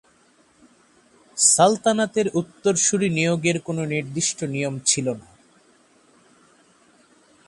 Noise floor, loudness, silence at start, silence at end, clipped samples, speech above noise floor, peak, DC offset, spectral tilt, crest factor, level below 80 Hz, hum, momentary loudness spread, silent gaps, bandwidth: -58 dBFS; -20 LUFS; 1.35 s; 2.25 s; under 0.1%; 37 dB; -2 dBFS; under 0.1%; -3.5 dB/octave; 22 dB; -64 dBFS; none; 10 LU; none; 11.5 kHz